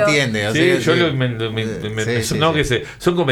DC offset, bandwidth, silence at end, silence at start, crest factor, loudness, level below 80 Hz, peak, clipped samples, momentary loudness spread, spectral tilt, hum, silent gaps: under 0.1%; 19 kHz; 0 s; 0 s; 16 dB; -18 LUFS; -40 dBFS; -2 dBFS; under 0.1%; 7 LU; -5 dB/octave; none; none